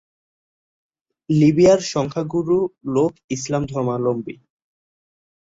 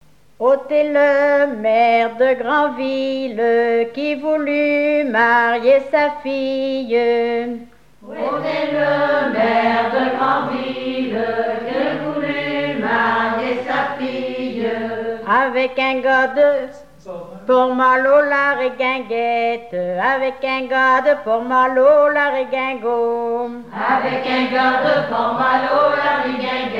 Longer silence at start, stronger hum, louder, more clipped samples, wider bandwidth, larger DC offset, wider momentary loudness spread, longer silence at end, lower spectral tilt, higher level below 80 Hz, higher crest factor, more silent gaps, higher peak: first, 1.3 s vs 0.4 s; neither; about the same, -19 LUFS vs -17 LUFS; neither; about the same, 7.8 kHz vs 7.4 kHz; second, under 0.1% vs 0.4%; about the same, 10 LU vs 9 LU; first, 1.25 s vs 0 s; about the same, -6.5 dB/octave vs -6 dB/octave; first, -54 dBFS vs -60 dBFS; about the same, 18 dB vs 14 dB; first, 3.24-3.28 s vs none; about the same, -4 dBFS vs -2 dBFS